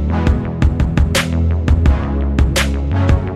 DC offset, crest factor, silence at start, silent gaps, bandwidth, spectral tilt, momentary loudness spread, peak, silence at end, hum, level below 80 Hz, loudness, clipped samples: under 0.1%; 14 dB; 0 s; none; 13.5 kHz; -6 dB/octave; 3 LU; 0 dBFS; 0 s; none; -18 dBFS; -16 LUFS; under 0.1%